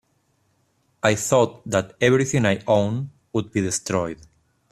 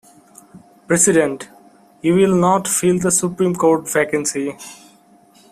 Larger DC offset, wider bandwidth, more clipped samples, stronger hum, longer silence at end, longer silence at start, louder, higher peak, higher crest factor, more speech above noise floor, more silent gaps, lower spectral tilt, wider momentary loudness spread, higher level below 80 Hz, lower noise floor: neither; second, 14.5 kHz vs 16 kHz; neither; neither; second, 0.55 s vs 0.8 s; first, 1.05 s vs 0.55 s; second, -22 LUFS vs -16 LUFS; about the same, -2 dBFS vs 0 dBFS; about the same, 20 dB vs 18 dB; first, 46 dB vs 34 dB; neither; about the same, -5 dB/octave vs -4.5 dB/octave; second, 9 LU vs 14 LU; about the same, -56 dBFS vs -56 dBFS; first, -67 dBFS vs -50 dBFS